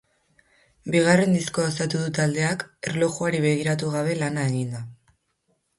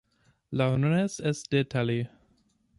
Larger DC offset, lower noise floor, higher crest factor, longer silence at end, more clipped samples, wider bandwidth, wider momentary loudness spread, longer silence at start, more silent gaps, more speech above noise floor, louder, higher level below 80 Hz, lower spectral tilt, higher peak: neither; about the same, -71 dBFS vs -68 dBFS; about the same, 18 dB vs 18 dB; first, 0.85 s vs 0.7 s; neither; about the same, 11.5 kHz vs 11.5 kHz; first, 11 LU vs 8 LU; first, 0.85 s vs 0.5 s; neither; first, 48 dB vs 41 dB; first, -23 LUFS vs -28 LUFS; about the same, -62 dBFS vs -60 dBFS; about the same, -5.5 dB/octave vs -6.5 dB/octave; first, -6 dBFS vs -12 dBFS